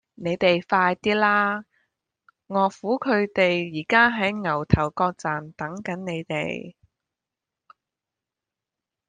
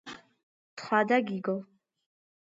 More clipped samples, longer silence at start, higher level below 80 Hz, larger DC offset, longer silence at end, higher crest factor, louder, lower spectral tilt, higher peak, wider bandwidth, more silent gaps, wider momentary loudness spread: neither; first, 0.2 s vs 0.05 s; first, -50 dBFS vs -82 dBFS; neither; first, 2.4 s vs 0.8 s; about the same, 22 dB vs 20 dB; first, -23 LUFS vs -29 LUFS; about the same, -6 dB/octave vs -6 dB/octave; first, -2 dBFS vs -12 dBFS; first, 9.4 kHz vs 8 kHz; second, none vs 0.43-0.77 s; second, 11 LU vs 23 LU